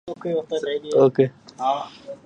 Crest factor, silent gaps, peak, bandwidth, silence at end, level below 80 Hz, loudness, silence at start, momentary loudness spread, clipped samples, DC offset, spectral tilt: 18 dB; none; -4 dBFS; 8.8 kHz; 0.1 s; -68 dBFS; -22 LUFS; 0.05 s; 9 LU; under 0.1%; under 0.1%; -7 dB/octave